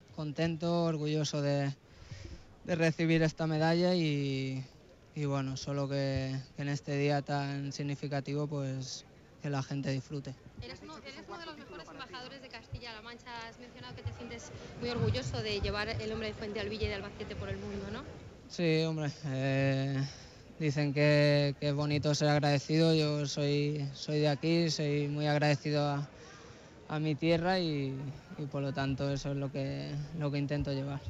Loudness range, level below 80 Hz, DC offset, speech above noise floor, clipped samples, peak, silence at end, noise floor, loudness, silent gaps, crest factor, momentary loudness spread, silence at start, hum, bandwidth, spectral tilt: 11 LU; -56 dBFS; under 0.1%; 20 dB; under 0.1%; -18 dBFS; 0 s; -53 dBFS; -33 LUFS; none; 16 dB; 17 LU; 0.1 s; none; 8 kHz; -6 dB/octave